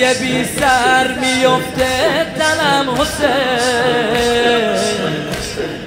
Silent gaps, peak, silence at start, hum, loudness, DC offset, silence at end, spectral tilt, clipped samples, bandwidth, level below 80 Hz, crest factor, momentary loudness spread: none; 0 dBFS; 0 s; none; -14 LUFS; under 0.1%; 0 s; -3.5 dB/octave; under 0.1%; 16.5 kHz; -38 dBFS; 14 dB; 5 LU